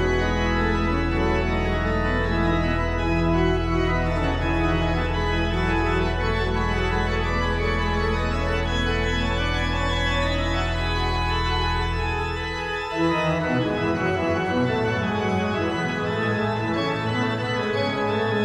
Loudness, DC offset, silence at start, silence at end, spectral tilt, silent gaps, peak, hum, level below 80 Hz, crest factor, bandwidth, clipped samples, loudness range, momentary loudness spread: -23 LUFS; under 0.1%; 0 s; 0 s; -6 dB/octave; none; -10 dBFS; none; -30 dBFS; 14 dB; 10.5 kHz; under 0.1%; 1 LU; 2 LU